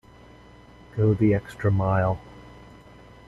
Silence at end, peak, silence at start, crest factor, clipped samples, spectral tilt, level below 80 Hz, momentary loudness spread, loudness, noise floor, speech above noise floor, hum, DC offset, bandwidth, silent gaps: 0.8 s; -10 dBFS; 0.95 s; 16 dB; under 0.1%; -9.5 dB/octave; -48 dBFS; 14 LU; -24 LUFS; -49 dBFS; 27 dB; none; under 0.1%; 7.4 kHz; none